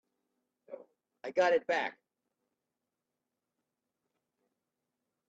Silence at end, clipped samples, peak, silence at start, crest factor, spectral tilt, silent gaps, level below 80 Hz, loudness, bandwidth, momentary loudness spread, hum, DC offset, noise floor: 3.4 s; under 0.1%; -16 dBFS; 0.7 s; 22 dB; -3.5 dB/octave; none; -88 dBFS; -31 LUFS; 7.8 kHz; 23 LU; none; under 0.1%; -88 dBFS